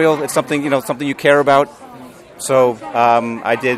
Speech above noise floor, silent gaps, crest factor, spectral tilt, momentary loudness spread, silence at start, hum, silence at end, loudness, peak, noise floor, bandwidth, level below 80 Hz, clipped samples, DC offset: 22 dB; none; 16 dB; -4.5 dB/octave; 7 LU; 0 s; none; 0 s; -15 LUFS; 0 dBFS; -37 dBFS; 15 kHz; -58 dBFS; under 0.1%; under 0.1%